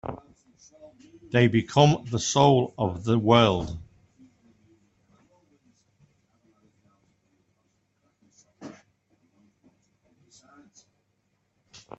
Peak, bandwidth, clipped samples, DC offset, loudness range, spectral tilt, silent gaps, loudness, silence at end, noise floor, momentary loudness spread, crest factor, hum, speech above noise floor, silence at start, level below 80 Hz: -4 dBFS; 8.2 kHz; under 0.1%; under 0.1%; 6 LU; -5.5 dB/octave; none; -22 LUFS; 3.3 s; -73 dBFS; 26 LU; 24 dB; none; 51 dB; 0.05 s; -56 dBFS